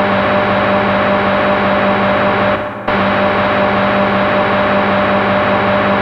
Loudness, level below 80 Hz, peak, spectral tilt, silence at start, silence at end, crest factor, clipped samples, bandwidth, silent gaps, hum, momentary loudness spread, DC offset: -13 LUFS; -38 dBFS; -2 dBFS; -7.5 dB/octave; 0 s; 0 s; 10 dB; under 0.1%; 6.2 kHz; none; 50 Hz at -25 dBFS; 1 LU; under 0.1%